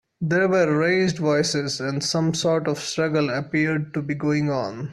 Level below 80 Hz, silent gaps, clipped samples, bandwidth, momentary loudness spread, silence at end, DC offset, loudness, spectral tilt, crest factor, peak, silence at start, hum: -60 dBFS; none; under 0.1%; 12.5 kHz; 6 LU; 0 s; under 0.1%; -22 LUFS; -5 dB/octave; 14 dB; -8 dBFS; 0.2 s; none